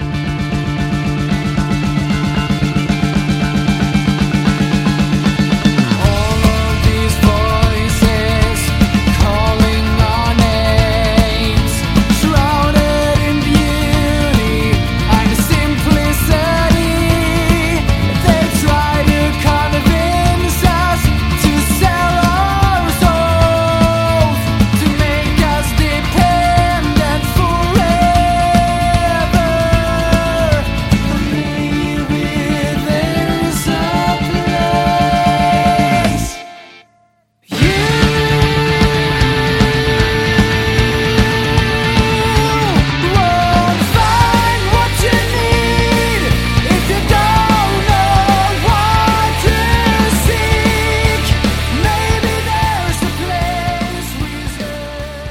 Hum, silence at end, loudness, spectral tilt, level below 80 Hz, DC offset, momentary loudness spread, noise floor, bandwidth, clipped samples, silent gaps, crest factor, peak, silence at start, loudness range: none; 0 s; -13 LUFS; -5.5 dB/octave; -20 dBFS; under 0.1%; 4 LU; -55 dBFS; 16.5 kHz; under 0.1%; none; 12 dB; 0 dBFS; 0 s; 3 LU